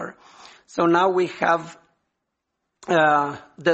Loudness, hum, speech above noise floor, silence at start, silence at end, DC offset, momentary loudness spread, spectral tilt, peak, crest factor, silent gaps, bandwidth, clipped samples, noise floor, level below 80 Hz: -21 LUFS; none; 59 dB; 0 s; 0 s; under 0.1%; 18 LU; -5.5 dB/octave; -2 dBFS; 20 dB; none; 8.4 kHz; under 0.1%; -79 dBFS; -66 dBFS